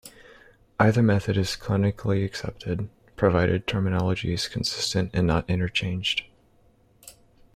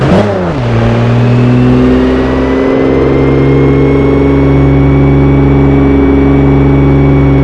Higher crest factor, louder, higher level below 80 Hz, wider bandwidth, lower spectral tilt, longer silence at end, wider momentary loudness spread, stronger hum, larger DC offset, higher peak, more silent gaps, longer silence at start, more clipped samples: first, 20 dB vs 6 dB; second, -25 LUFS vs -7 LUFS; second, -48 dBFS vs -16 dBFS; first, 14.5 kHz vs 7 kHz; second, -5.5 dB/octave vs -9 dB/octave; first, 0.45 s vs 0 s; first, 10 LU vs 3 LU; neither; neither; second, -6 dBFS vs 0 dBFS; neither; about the same, 0.05 s vs 0 s; second, under 0.1% vs 4%